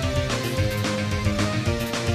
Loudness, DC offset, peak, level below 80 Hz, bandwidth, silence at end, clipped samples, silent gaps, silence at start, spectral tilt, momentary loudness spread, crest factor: -24 LUFS; under 0.1%; -10 dBFS; -36 dBFS; 15.5 kHz; 0 s; under 0.1%; none; 0 s; -5 dB/octave; 1 LU; 14 dB